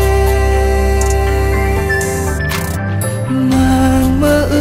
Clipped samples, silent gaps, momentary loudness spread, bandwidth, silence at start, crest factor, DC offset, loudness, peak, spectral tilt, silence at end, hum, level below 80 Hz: under 0.1%; none; 6 LU; 16.5 kHz; 0 s; 12 dB; under 0.1%; -14 LUFS; -2 dBFS; -6 dB/octave; 0 s; none; -18 dBFS